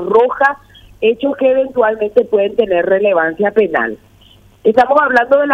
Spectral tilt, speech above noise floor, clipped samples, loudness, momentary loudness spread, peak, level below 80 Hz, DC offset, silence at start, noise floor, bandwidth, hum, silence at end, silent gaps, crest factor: -6.5 dB/octave; 33 dB; under 0.1%; -13 LUFS; 7 LU; 0 dBFS; -50 dBFS; under 0.1%; 0 s; -45 dBFS; 7.2 kHz; none; 0 s; none; 12 dB